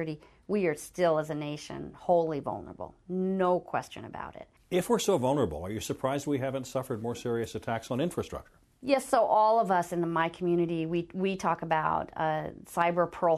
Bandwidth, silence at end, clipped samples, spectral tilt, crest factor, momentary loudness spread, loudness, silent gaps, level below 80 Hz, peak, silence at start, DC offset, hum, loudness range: 13.5 kHz; 0 s; under 0.1%; -5.5 dB/octave; 18 dB; 13 LU; -30 LUFS; none; -58 dBFS; -12 dBFS; 0 s; under 0.1%; none; 4 LU